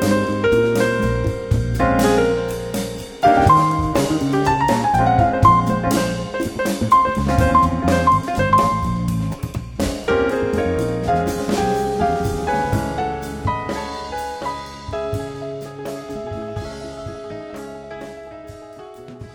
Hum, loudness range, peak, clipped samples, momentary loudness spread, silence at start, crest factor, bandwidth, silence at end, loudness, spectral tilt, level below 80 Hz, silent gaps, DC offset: none; 13 LU; -2 dBFS; under 0.1%; 17 LU; 0 s; 18 dB; over 20 kHz; 0 s; -19 LUFS; -6 dB/octave; -34 dBFS; none; under 0.1%